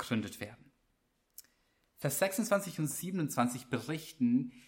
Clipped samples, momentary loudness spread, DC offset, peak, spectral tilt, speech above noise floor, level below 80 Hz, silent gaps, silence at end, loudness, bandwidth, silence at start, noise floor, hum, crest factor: under 0.1%; 20 LU; under 0.1%; -16 dBFS; -5 dB/octave; 43 dB; -72 dBFS; none; 0.05 s; -34 LUFS; 17 kHz; 0 s; -77 dBFS; none; 20 dB